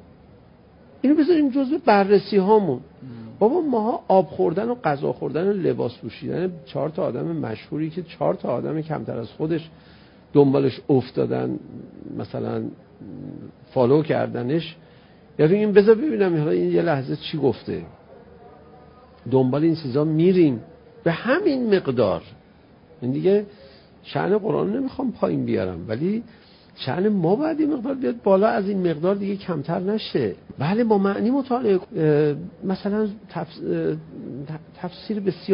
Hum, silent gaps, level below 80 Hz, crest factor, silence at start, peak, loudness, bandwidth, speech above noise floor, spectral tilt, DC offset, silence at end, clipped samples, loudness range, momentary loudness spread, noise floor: none; none; -56 dBFS; 20 dB; 1.05 s; -2 dBFS; -22 LUFS; 5.4 kHz; 30 dB; -12 dB/octave; under 0.1%; 0 s; under 0.1%; 6 LU; 15 LU; -51 dBFS